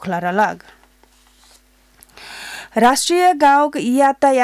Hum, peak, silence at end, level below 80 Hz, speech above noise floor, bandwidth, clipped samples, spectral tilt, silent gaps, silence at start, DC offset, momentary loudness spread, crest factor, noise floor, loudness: none; -4 dBFS; 0 s; -56 dBFS; 38 dB; 16 kHz; under 0.1%; -3.5 dB/octave; none; 0 s; under 0.1%; 19 LU; 12 dB; -53 dBFS; -15 LUFS